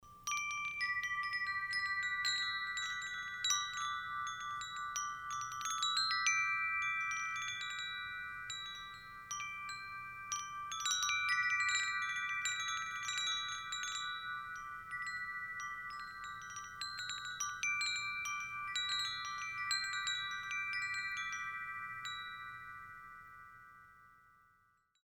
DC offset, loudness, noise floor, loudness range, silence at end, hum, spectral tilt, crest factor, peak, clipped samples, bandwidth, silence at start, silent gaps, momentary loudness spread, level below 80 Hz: under 0.1%; -38 LUFS; -74 dBFS; 7 LU; 0.9 s; none; 2 dB/octave; 22 dB; -18 dBFS; under 0.1%; 17.5 kHz; 0 s; none; 13 LU; -70 dBFS